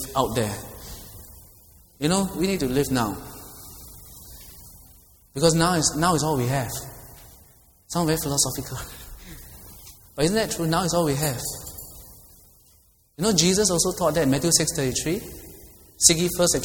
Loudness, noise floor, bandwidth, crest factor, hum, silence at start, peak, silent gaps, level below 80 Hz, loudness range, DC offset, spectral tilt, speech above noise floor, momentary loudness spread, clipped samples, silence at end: -22 LUFS; -58 dBFS; over 20 kHz; 26 dB; none; 0 s; 0 dBFS; none; -46 dBFS; 5 LU; under 0.1%; -3.5 dB/octave; 36 dB; 23 LU; under 0.1%; 0 s